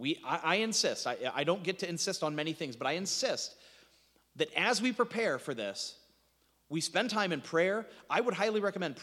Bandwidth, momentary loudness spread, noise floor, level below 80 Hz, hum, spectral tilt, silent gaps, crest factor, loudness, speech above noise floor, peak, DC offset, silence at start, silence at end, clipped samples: 16 kHz; 8 LU; -72 dBFS; -80 dBFS; none; -3 dB/octave; none; 22 dB; -33 LUFS; 39 dB; -12 dBFS; under 0.1%; 0 s; 0 s; under 0.1%